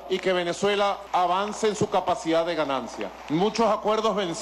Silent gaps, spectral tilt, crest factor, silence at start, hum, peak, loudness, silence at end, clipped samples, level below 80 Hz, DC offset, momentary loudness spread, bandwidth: none; -4.5 dB/octave; 12 dB; 0 s; none; -14 dBFS; -25 LUFS; 0 s; under 0.1%; -58 dBFS; under 0.1%; 5 LU; 13.5 kHz